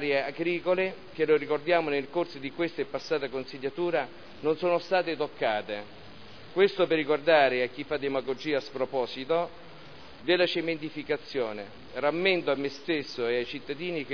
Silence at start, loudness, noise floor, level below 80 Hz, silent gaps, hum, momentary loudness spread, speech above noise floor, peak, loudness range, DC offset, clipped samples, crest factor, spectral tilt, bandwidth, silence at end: 0 s; -29 LUFS; -48 dBFS; -66 dBFS; none; none; 12 LU; 20 dB; -8 dBFS; 4 LU; 0.4%; under 0.1%; 20 dB; -6 dB/octave; 5.4 kHz; 0 s